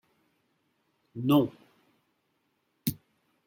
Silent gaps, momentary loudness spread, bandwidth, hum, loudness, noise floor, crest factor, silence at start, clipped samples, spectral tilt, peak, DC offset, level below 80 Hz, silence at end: none; 20 LU; 16.5 kHz; none; -29 LUFS; -76 dBFS; 22 dB; 1.15 s; under 0.1%; -6.5 dB/octave; -12 dBFS; under 0.1%; -68 dBFS; 0.5 s